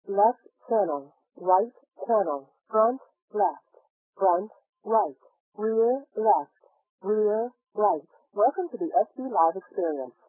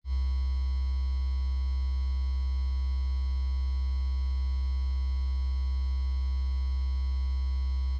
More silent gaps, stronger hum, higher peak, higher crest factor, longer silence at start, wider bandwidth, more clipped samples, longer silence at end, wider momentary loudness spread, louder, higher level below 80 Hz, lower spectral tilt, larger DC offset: first, 3.22-3.28 s, 3.90-4.13 s, 4.69-4.73 s, 5.40-5.52 s, 6.89-6.98 s vs none; neither; first, -8 dBFS vs -22 dBFS; first, 18 dB vs 6 dB; about the same, 0.05 s vs 0.05 s; second, 1.9 kHz vs 5.6 kHz; neither; first, 0.2 s vs 0 s; first, 11 LU vs 0 LU; first, -26 LUFS vs -31 LUFS; second, under -90 dBFS vs -28 dBFS; first, -12 dB/octave vs -6.5 dB/octave; neither